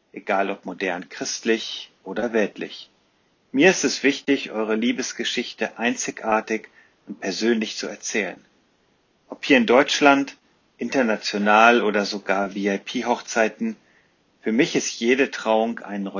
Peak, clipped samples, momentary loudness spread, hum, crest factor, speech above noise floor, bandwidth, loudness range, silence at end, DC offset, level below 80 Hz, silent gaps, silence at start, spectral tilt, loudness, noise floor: -2 dBFS; under 0.1%; 14 LU; none; 22 dB; 42 dB; 7.6 kHz; 7 LU; 0 s; under 0.1%; -68 dBFS; none; 0.15 s; -3.5 dB/octave; -22 LUFS; -64 dBFS